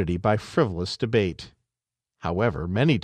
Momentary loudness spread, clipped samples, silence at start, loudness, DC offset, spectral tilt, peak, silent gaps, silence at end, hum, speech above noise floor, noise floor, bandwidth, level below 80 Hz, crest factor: 10 LU; under 0.1%; 0 s; -25 LUFS; under 0.1%; -7 dB/octave; -8 dBFS; none; 0 s; none; 65 dB; -89 dBFS; 10 kHz; -46 dBFS; 18 dB